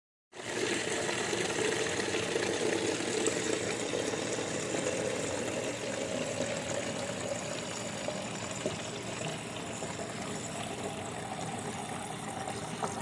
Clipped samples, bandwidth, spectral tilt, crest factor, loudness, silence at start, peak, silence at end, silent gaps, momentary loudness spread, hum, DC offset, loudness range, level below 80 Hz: under 0.1%; 12 kHz; -3 dB/octave; 20 dB; -34 LUFS; 0.35 s; -16 dBFS; 0 s; none; 7 LU; none; under 0.1%; 6 LU; -66 dBFS